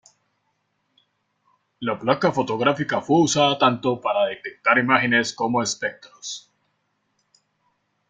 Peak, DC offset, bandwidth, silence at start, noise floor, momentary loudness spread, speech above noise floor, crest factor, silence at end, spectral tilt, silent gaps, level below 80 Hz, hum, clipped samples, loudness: -2 dBFS; under 0.1%; 9.6 kHz; 1.8 s; -72 dBFS; 14 LU; 51 dB; 22 dB; 1.7 s; -4 dB/octave; none; -64 dBFS; none; under 0.1%; -21 LUFS